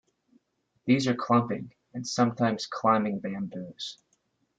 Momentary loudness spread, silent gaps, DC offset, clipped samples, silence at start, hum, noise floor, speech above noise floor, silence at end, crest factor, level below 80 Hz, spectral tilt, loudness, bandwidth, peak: 13 LU; none; under 0.1%; under 0.1%; 0.85 s; none; -73 dBFS; 46 dB; 0.65 s; 20 dB; -70 dBFS; -5.5 dB/octave; -28 LUFS; 9 kHz; -10 dBFS